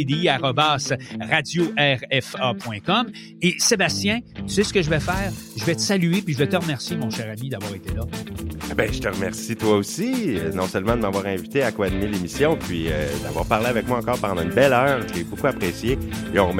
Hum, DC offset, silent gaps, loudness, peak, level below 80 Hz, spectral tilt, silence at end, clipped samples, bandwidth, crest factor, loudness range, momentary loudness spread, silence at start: none; under 0.1%; none; -22 LUFS; -2 dBFS; -40 dBFS; -4.5 dB/octave; 0 s; under 0.1%; 16.5 kHz; 20 dB; 4 LU; 9 LU; 0 s